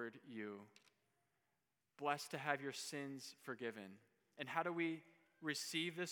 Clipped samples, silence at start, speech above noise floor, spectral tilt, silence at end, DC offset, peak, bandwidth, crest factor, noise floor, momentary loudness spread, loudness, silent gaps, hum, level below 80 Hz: under 0.1%; 0 s; 43 dB; -3.5 dB/octave; 0 s; under 0.1%; -22 dBFS; 19.5 kHz; 24 dB; -89 dBFS; 10 LU; -45 LUFS; none; none; under -90 dBFS